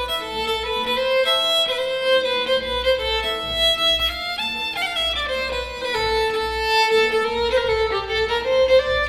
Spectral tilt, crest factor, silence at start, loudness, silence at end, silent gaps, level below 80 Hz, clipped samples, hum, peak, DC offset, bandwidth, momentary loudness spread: -2.5 dB/octave; 14 dB; 0 s; -20 LUFS; 0 s; none; -40 dBFS; under 0.1%; none; -6 dBFS; under 0.1%; 16 kHz; 7 LU